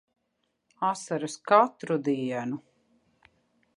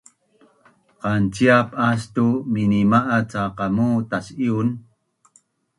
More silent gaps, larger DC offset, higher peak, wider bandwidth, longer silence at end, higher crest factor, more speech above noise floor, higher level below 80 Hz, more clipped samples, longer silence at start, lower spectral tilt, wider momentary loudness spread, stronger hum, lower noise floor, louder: neither; neither; second, -8 dBFS vs -2 dBFS; about the same, 11.5 kHz vs 11.5 kHz; first, 1.2 s vs 1 s; about the same, 22 dB vs 20 dB; first, 51 dB vs 40 dB; second, -80 dBFS vs -52 dBFS; neither; second, 0.8 s vs 1.05 s; second, -5.5 dB/octave vs -7 dB/octave; about the same, 11 LU vs 9 LU; neither; first, -77 dBFS vs -60 dBFS; second, -27 LUFS vs -20 LUFS